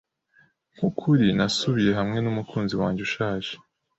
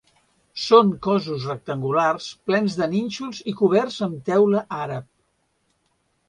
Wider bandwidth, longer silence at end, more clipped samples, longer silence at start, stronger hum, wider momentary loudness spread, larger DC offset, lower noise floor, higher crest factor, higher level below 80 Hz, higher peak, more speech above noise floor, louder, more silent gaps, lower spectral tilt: second, 8.2 kHz vs 10.5 kHz; second, 0.4 s vs 1.25 s; neither; first, 0.8 s vs 0.55 s; neither; second, 8 LU vs 14 LU; neither; second, -62 dBFS vs -69 dBFS; second, 16 dB vs 22 dB; first, -54 dBFS vs -62 dBFS; second, -8 dBFS vs -2 dBFS; second, 38 dB vs 48 dB; about the same, -24 LUFS vs -22 LUFS; neither; about the same, -6 dB/octave vs -6 dB/octave